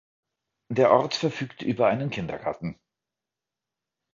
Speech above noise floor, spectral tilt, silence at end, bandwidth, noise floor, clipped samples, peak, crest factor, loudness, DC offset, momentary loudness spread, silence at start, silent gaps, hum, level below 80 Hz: 64 dB; -6 dB/octave; 1.4 s; 7.6 kHz; -88 dBFS; under 0.1%; -4 dBFS; 22 dB; -25 LUFS; under 0.1%; 12 LU; 0.7 s; none; none; -62 dBFS